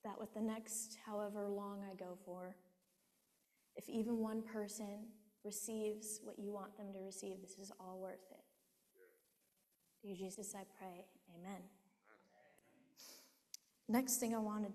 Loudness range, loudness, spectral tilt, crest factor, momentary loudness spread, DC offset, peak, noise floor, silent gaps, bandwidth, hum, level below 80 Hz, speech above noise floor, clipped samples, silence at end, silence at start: 10 LU; -46 LUFS; -4 dB/octave; 24 dB; 18 LU; under 0.1%; -24 dBFS; -81 dBFS; none; 14 kHz; none; -86 dBFS; 35 dB; under 0.1%; 0 s; 0.05 s